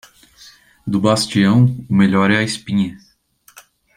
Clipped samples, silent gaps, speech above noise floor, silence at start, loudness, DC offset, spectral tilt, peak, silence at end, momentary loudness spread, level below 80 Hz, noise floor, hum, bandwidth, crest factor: under 0.1%; none; 39 dB; 0.85 s; -16 LUFS; under 0.1%; -6 dB/octave; -2 dBFS; 1 s; 9 LU; -54 dBFS; -54 dBFS; none; 15 kHz; 16 dB